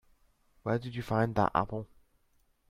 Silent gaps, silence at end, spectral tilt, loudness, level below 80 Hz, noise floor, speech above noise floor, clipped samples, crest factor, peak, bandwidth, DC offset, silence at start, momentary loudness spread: none; 0.85 s; -8 dB/octave; -32 LUFS; -56 dBFS; -71 dBFS; 40 dB; under 0.1%; 22 dB; -12 dBFS; 14 kHz; under 0.1%; 0.65 s; 13 LU